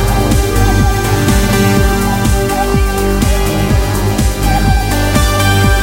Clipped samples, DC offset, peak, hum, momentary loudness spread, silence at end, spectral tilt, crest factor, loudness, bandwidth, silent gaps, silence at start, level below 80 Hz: under 0.1%; under 0.1%; 0 dBFS; none; 3 LU; 0 s; -5 dB/octave; 10 dB; -12 LUFS; 17 kHz; none; 0 s; -16 dBFS